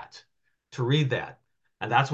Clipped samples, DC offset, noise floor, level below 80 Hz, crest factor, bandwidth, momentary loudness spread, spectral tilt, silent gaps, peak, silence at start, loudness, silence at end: under 0.1%; under 0.1%; -73 dBFS; -66 dBFS; 22 dB; 8 kHz; 18 LU; -6 dB/octave; none; -6 dBFS; 0 s; -27 LUFS; 0 s